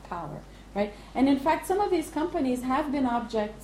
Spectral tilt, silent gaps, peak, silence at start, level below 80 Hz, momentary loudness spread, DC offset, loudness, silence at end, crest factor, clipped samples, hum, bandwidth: -5.5 dB/octave; none; -12 dBFS; 0 s; -50 dBFS; 12 LU; under 0.1%; -28 LUFS; 0 s; 14 dB; under 0.1%; none; 15 kHz